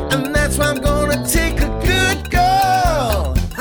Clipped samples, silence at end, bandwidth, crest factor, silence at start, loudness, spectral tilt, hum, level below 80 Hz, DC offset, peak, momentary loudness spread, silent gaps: under 0.1%; 0 s; over 20 kHz; 12 dB; 0 s; -16 LUFS; -4.5 dB/octave; none; -22 dBFS; under 0.1%; -4 dBFS; 5 LU; none